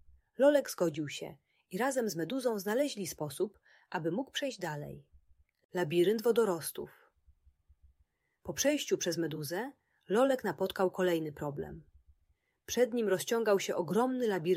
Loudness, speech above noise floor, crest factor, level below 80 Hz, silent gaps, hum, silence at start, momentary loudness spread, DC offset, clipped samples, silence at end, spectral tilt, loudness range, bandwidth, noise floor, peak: -33 LUFS; 43 dB; 18 dB; -68 dBFS; 5.65-5.69 s; none; 0.4 s; 14 LU; under 0.1%; under 0.1%; 0 s; -4.5 dB/octave; 4 LU; 16 kHz; -75 dBFS; -14 dBFS